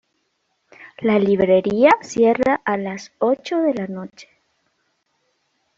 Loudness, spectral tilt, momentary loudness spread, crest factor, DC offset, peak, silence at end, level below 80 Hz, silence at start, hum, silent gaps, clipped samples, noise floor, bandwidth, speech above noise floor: -18 LUFS; -6 dB/octave; 14 LU; 18 dB; under 0.1%; -2 dBFS; 1.55 s; -58 dBFS; 0.8 s; none; none; under 0.1%; -70 dBFS; 7.8 kHz; 52 dB